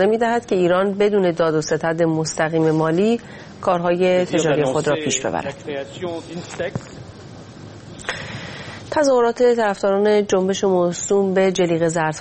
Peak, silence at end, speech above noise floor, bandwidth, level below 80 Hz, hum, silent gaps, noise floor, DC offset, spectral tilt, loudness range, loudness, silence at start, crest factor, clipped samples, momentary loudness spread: -4 dBFS; 0 s; 20 dB; 8.8 kHz; -54 dBFS; none; none; -38 dBFS; under 0.1%; -5 dB/octave; 10 LU; -19 LUFS; 0 s; 16 dB; under 0.1%; 15 LU